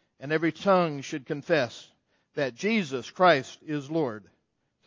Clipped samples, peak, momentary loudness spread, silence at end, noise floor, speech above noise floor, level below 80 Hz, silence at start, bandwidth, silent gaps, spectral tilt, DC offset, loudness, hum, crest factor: under 0.1%; -8 dBFS; 13 LU; 0.65 s; -75 dBFS; 48 dB; -74 dBFS; 0.2 s; 7.8 kHz; none; -5.5 dB/octave; under 0.1%; -27 LUFS; none; 20 dB